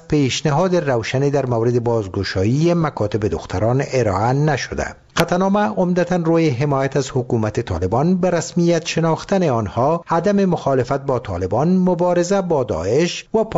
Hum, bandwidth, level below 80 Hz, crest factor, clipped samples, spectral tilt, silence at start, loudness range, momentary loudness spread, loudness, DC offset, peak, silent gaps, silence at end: none; 13 kHz; -44 dBFS; 16 dB; under 0.1%; -6.5 dB/octave; 0.1 s; 1 LU; 5 LU; -18 LUFS; 0.1%; 0 dBFS; none; 0 s